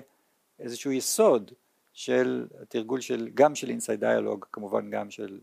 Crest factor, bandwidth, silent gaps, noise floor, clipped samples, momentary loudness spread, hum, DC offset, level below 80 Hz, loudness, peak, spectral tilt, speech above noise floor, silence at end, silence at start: 20 dB; 15.5 kHz; none; -70 dBFS; under 0.1%; 13 LU; none; under 0.1%; -82 dBFS; -27 LUFS; -8 dBFS; -4 dB/octave; 42 dB; 0.05 s; 0 s